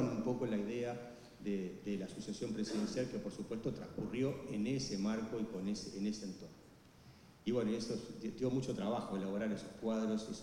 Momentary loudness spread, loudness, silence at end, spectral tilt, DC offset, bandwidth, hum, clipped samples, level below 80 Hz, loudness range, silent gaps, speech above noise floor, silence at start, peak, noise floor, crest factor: 8 LU; -40 LUFS; 0 s; -6 dB/octave; under 0.1%; 12.5 kHz; none; under 0.1%; -66 dBFS; 2 LU; none; 21 dB; 0 s; -24 dBFS; -61 dBFS; 16 dB